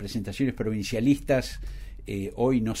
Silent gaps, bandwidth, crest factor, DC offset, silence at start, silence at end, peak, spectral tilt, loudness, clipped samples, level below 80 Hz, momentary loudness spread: none; 16 kHz; 16 dB; under 0.1%; 0 s; 0 s; -10 dBFS; -6 dB/octave; -27 LUFS; under 0.1%; -42 dBFS; 14 LU